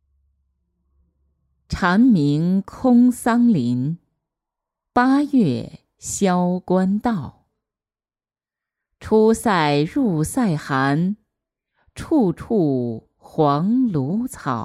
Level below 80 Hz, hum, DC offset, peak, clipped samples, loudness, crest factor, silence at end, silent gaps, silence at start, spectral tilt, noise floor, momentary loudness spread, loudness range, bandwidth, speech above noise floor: -50 dBFS; none; under 0.1%; -4 dBFS; under 0.1%; -19 LUFS; 16 dB; 0 s; none; 1.7 s; -6.5 dB/octave; under -90 dBFS; 13 LU; 4 LU; 13.5 kHz; over 72 dB